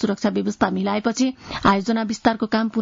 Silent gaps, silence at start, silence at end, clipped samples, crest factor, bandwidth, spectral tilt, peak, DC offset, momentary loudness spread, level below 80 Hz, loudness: none; 0 s; 0 s; under 0.1%; 16 dB; 7.6 kHz; -5.5 dB/octave; -4 dBFS; under 0.1%; 4 LU; -50 dBFS; -21 LUFS